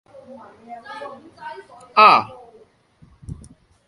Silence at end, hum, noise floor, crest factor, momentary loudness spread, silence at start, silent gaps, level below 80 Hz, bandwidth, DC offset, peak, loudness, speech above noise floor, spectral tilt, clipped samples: 0.55 s; none; -53 dBFS; 22 dB; 28 LU; 0.7 s; none; -52 dBFS; 11 kHz; under 0.1%; 0 dBFS; -14 LUFS; 34 dB; -4.5 dB/octave; under 0.1%